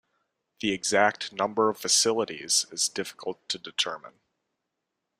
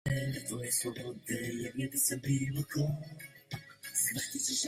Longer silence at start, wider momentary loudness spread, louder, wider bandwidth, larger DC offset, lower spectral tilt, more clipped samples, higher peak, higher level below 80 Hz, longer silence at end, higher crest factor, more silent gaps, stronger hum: first, 0.6 s vs 0.05 s; about the same, 12 LU vs 14 LU; first, -26 LUFS vs -34 LUFS; about the same, 15.5 kHz vs 16 kHz; neither; second, -1 dB/octave vs -3.5 dB/octave; neither; first, -6 dBFS vs -16 dBFS; second, -70 dBFS vs -60 dBFS; first, 1.15 s vs 0 s; first, 24 dB vs 18 dB; neither; neither